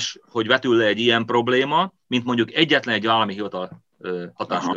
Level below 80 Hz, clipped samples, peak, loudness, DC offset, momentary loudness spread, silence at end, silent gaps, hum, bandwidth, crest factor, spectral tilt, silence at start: -70 dBFS; under 0.1%; -2 dBFS; -20 LUFS; under 0.1%; 12 LU; 0 s; none; none; 7.6 kHz; 20 dB; -4.5 dB/octave; 0 s